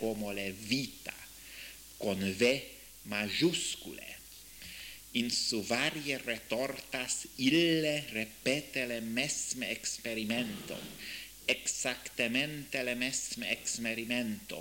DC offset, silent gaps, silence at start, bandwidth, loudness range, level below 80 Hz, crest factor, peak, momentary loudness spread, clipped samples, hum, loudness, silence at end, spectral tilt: under 0.1%; none; 0 s; 17 kHz; 3 LU; -64 dBFS; 22 dB; -14 dBFS; 16 LU; under 0.1%; none; -33 LUFS; 0 s; -3 dB/octave